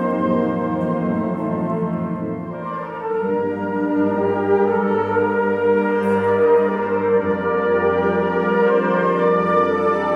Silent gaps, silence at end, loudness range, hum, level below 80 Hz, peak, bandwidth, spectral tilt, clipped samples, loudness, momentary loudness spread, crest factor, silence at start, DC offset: none; 0 s; 5 LU; none; -58 dBFS; -6 dBFS; 5.6 kHz; -9 dB/octave; under 0.1%; -19 LUFS; 7 LU; 12 dB; 0 s; under 0.1%